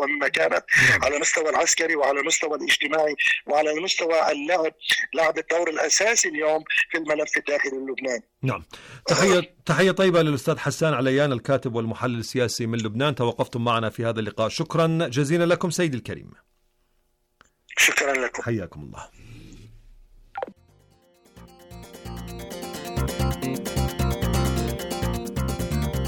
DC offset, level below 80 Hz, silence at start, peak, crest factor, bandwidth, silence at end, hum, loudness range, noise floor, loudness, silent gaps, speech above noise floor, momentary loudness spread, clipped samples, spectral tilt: under 0.1%; -40 dBFS; 0 s; -8 dBFS; 16 dB; 17.5 kHz; 0 s; none; 12 LU; -68 dBFS; -22 LUFS; none; 45 dB; 14 LU; under 0.1%; -3.5 dB/octave